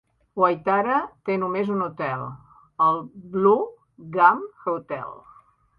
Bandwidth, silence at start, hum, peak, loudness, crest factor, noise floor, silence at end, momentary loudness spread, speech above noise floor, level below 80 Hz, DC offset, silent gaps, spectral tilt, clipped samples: 5.2 kHz; 0.35 s; none; -2 dBFS; -23 LUFS; 22 dB; -54 dBFS; 0.65 s; 15 LU; 31 dB; -64 dBFS; under 0.1%; none; -9.5 dB/octave; under 0.1%